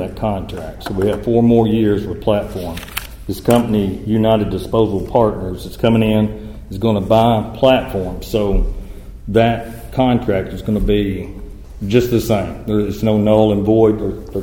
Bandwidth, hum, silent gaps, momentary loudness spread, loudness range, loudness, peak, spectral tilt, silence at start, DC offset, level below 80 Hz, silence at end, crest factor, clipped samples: 17 kHz; none; none; 14 LU; 2 LU; -16 LUFS; 0 dBFS; -7 dB/octave; 0 s; under 0.1%; -30 dBFS; 0 s; 16 dB; under 0.1%